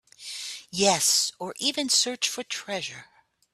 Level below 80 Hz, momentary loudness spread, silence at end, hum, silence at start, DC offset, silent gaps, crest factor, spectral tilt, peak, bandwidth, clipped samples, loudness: -72 dBFS; 15 LU; 0.5 s; none; 0.2 s; under 0.1%; none; 22 dB; -1 dB/octave; -6 dBFS; 15.5 kHz; under 0.1%; -25 LUFS